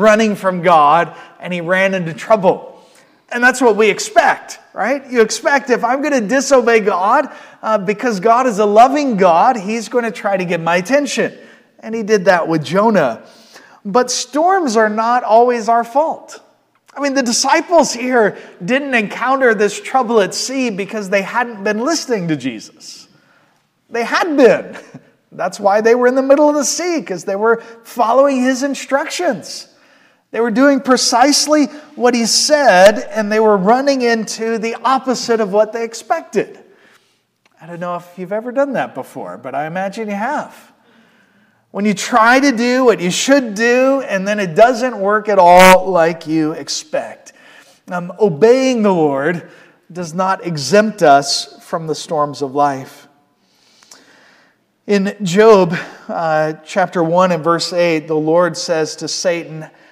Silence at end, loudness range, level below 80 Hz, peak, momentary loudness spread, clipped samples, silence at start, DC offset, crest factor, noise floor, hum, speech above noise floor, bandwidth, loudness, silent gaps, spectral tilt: 0.25 s; 8 LU; -54 dBFS; 0 dBFS; 14 LU; 0.2%; 0 s; under 0.1%; 14 dB; -59 dBFS; none; 45 dB; 16 kHz; -14 LUFS; none; -4 dB/octave